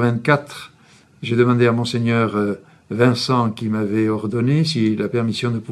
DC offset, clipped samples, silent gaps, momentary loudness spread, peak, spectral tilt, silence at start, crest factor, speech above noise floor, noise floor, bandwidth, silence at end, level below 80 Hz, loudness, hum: under 0.1%; under 0.1%; none; 8 LU; 0 dBFS; -6.5 dB/octave; 0 s; 18 dB; 32 dB; -51 dBFS; 12 kHz; 0 s; -60 dBFS; -19 LUFS; none